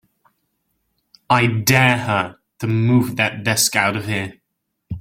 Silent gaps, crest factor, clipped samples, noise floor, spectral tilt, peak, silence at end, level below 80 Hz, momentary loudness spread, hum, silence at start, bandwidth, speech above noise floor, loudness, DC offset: none; 20 dB; under 0.1%; -75 dBFS; -4 dB/octave; 0 dBFS; 0 s; -52 dBFS; 13 LU; none; 1.3 s; 16.5 kHz; 58 dB; -17 LUFS; under 0.1%